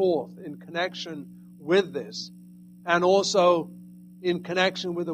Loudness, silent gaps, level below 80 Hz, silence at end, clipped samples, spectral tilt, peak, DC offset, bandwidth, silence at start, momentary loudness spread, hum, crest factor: -25 LUFS; none; -70 dBFS; 0 s; under 0.1%; -4.5 dB/octave; -8 dBFS; under 0.1%; 14.5 kHz; 0 s; 20 LU; 60 Hz at -45 dBFS; 18 dB